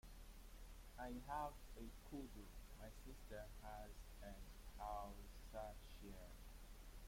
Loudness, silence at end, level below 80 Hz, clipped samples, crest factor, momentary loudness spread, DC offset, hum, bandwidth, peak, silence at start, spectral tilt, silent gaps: -57 LUFS; 0 s; -58 dBFS; under 0.1%; 18 dB; 12 LU; under 0.1%; none; 16.5 kHz; -36 dBFS; 0.05 s; -5 dB/octave; none